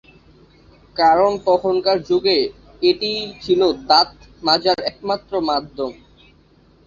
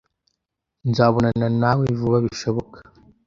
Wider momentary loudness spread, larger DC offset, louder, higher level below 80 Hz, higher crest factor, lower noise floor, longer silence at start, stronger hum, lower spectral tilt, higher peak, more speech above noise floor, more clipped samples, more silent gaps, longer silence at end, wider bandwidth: first, 11 LU vs 8 LU; neither; about the same, -18 LUFS vs -20 LUFS; about the same, -52 dBFS vs -50 dBFS; about the same, 18 dB vs 20 dB; second, -52 dBFS vs -80 dBFS; about the same, 0.95 s vs 0.85 s; neither; second, -4.5 dB/octave vs -7.5 dB/octave; about the same, -2 dBFS vs -2 dBFS; second, 35 dB vs 61 dB; neither; neither; first, 0.95 s vs 0.45 s; about the same, 7.4 kHz vs 7.6 kHz